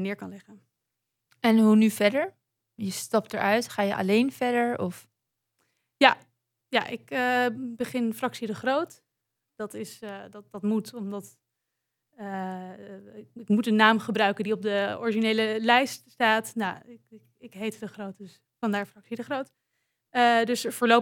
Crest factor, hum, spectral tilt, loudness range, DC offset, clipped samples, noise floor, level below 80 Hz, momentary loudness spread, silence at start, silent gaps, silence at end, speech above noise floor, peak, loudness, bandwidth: 24 dB; none; -4.5 dB/octave; 11 LU; under 0.1%; under 0.1%; -83 dBFS; -82 dBFS; 19 LU; 0 s; none; 0 s; 57 dB; -2 dBFS; -26 LUFS; 17 kHz